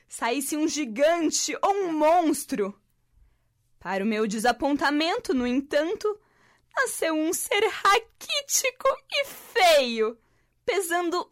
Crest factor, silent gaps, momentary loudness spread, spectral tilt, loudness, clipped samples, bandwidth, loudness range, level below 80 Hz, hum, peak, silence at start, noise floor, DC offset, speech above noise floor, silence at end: 14 dB; none; 9 LU; -2 dB/octave; -25 LUFS; under 0.1%; 16 kHz; 3 LU; -60 dBFS; none; -12 dBFS; 0.1 s; -66 dBFS; under 0.1%; 41 dB; 0.1 s